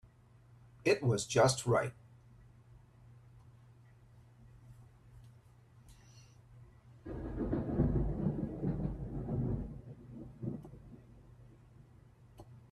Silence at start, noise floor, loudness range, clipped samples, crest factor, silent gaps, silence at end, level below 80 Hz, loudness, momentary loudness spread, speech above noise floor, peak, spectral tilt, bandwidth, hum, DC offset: 0.05 s; -62 dBFS; 16 LU; under 0.1%; 26 dB; none; 0.1 s; -50 dBFS; -35 LUFS; 28 LU; 31 dB; -14 dBFS; -5.5 dB/octave; 13 kHz; none; under 0.1%